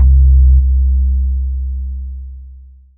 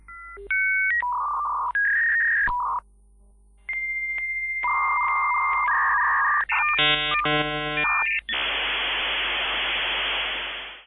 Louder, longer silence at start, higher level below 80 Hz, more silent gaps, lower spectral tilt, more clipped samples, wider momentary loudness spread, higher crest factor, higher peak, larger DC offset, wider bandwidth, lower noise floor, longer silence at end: first, -14 LUFS vs -22 LUFS; about the same, 0 s vs 0.1 s; first, -12 dBFS vs -50 dBFS; neither; first, -19 dB/octave vs -4.5 dB/octave; neither; first, 18 LU vs 7 LU; about the same, 10 dB vs 12 dB; first, -2 dBFS vs -12 dBFS; neither; second, 0.5 kHz vs 11 kHz; second, -37 dBFS vs -54 dBFS; first, 0.4 s vs 0.05 s